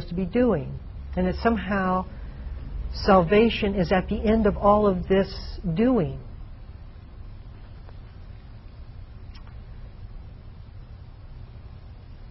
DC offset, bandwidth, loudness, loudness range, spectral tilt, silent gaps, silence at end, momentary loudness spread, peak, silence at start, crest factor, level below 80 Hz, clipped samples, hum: under 0.1%; 6 kHz; -23 LUFS; 22 LU; -5.5 dB/octave; none; 0 s; 25 LU; -6 dBFS; 0 s; 20 dB; -38 dBFS; under 0.1%; none